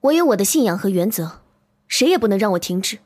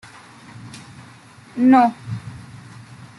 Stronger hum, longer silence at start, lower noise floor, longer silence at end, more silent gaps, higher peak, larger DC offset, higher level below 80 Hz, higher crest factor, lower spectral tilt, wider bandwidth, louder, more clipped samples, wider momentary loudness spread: neither; second, 0.05 s vs 0.65 s; first, -51 dBFS vs -45 dBFS; second, 0.1 s vs 0.8 s; neither; about the same, -4 dBFS vs -4 dBFS; neither; about the same, -58 dBFS vs -60 dBFS; about the same, 14 dB vs 18 dB; second, -4 dB/octave vs -7 dB/octave; first, 16 kHz vs 11.5 kHz; about the same, -18 LUFS vs -16 LUFS; neither; second, 7 LU vs 27 LU